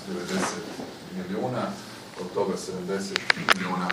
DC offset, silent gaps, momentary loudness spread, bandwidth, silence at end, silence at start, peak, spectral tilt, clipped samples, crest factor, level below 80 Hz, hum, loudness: under 0.1%; none; 15 LU; 15.5 kHz; 0 s; 0 s; 0 dBFS; -4 dB/octave; under 0.1%; 28 dB; -66 dBFS; none; -28 LUFS